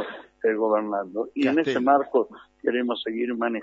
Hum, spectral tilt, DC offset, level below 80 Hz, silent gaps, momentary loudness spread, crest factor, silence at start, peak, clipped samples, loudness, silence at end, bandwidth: none; -6 dB/octave; under 0.1%; -70 dBFS; none; 9 LU; 18 dB; 0 s; -8 dBFS; under 0.1%; -25 LUFS; 0 s; 7.6 kHz